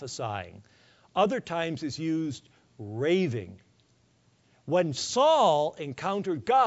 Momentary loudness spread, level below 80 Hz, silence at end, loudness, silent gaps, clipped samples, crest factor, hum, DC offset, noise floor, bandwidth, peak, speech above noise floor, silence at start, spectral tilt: 18 LU; -68 dBFS; 0 s; -28 LUFS; none; under 0.1%; 18 dB; none; under 0.1%; -65 dBFS; 8 kHz; -12 dBFS; 38 dB; 0 s; -5 dB/octave